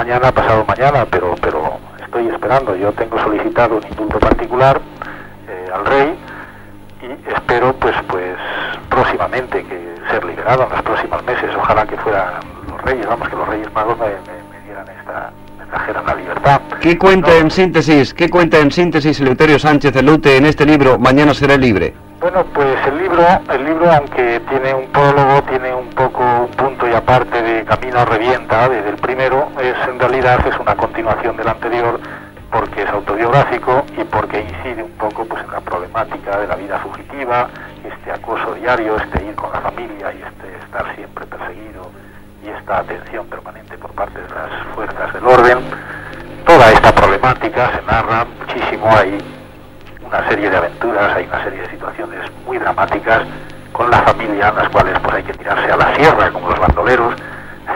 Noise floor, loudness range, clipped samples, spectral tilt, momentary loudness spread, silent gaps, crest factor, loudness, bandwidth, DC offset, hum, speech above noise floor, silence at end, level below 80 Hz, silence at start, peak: -36 dBFS; 10 LU; 0.2%; -6.5 dB/octave; 18 LU; none; 14 dB; -14 LUFS; 16.5 kHz; under 0.1%; 50 Hz at -40 dBFS; 23 dB; 0 s; -32 dBFS; 0 s; 0 dBFS